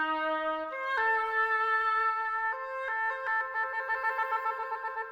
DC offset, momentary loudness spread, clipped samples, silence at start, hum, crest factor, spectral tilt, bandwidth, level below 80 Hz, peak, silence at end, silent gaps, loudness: under 0.1%; 7 LU; under 0.1%; 0 s; none; 12 dB; -2.5 dB/octave; 17.5 kHz; -70 dBFS; -18 dBFS; 0 s; none; -30 LUFS